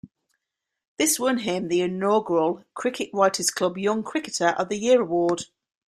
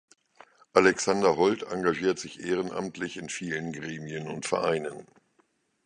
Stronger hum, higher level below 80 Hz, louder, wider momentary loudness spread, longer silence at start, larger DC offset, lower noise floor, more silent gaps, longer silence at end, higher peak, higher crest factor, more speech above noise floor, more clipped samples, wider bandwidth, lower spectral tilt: neither; about the same, -68 dBFS vs -64 dBFS; first, -23 LUFS vs -28 LUFS; second, 7 LU vs 13 LU; second, 0.05 s vs 0.75 s; neither; first, -82 dBFS vs -70 dBFS; first, 0.88-0.97 s vs none; second, 0.45 s vs 0.8 s; about the same, -6 dBFS vs -4 dBFS; second, 20 dB vs 26 dB; first, 59 dB vs 42 dB; neither; first, 15.5 kHz vs 10.5 kHz; about the same, -3.5 dB/octave vs -4.5 dB/octave